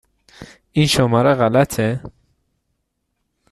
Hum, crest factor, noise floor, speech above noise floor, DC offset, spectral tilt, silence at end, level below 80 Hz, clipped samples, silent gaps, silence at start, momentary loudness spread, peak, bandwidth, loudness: none; 16 dB; -73 dBFS; 57 dB; under 0.1%; -5.5 dB/octave; 1.45 s; -48 dBFS; under 0.1%; none; 0.4 s; 9 LU; -2 dBFS; 13.5 kHz; -16 LUFS